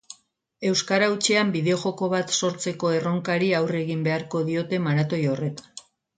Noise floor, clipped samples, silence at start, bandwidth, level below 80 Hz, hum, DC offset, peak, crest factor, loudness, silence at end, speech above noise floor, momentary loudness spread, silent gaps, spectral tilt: -49 dBFS; under 0.1%; 0.1 s; 9.6 kHz; -66 dBFS; none; under 0.1%; -6 dBFS; 18 dB; -24 LUFS; 0.4 s; 25 dB; 8 LU; none; -4.5 dB/octave